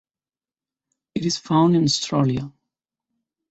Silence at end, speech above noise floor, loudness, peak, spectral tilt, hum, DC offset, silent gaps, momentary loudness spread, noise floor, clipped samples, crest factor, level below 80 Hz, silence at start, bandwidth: 1 s; over 70 dB; -20 LUFS; -6 dBFS; -5.5 dB/octave; none; under 0.1%; none; 13 LU; under -90 dBFS; under 0.1%; 18 dB; -56 dBFS; 1.15 s; 8.2 kHz